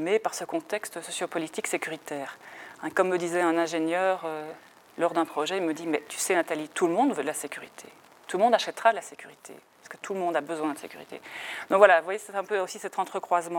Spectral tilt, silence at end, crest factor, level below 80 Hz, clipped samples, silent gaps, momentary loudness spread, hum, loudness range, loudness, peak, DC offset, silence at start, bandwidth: -3.5 dB/octave; 0 s; 24 dB; -84 dBFS; under 0.1%; none; 19 LU; none; 3 LU; -27 LUFS; -4 dBFS; under 0.1%; 0 s; 17.5 kHz